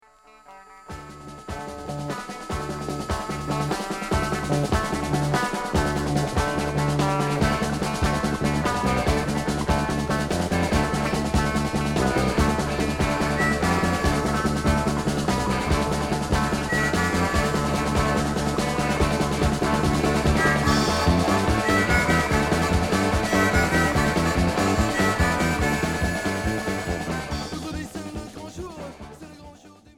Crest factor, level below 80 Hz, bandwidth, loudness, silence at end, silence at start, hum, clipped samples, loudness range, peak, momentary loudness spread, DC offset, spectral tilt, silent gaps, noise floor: 16 dB; -34 dBFS; 17 kHz; -23 LUFS; 0.25 s; 0.5 s; none; under 0.1%; 7 LU; -8 dBFS; 12 LU; under 0.1%; -5 dB/octave; none; -52 dBFS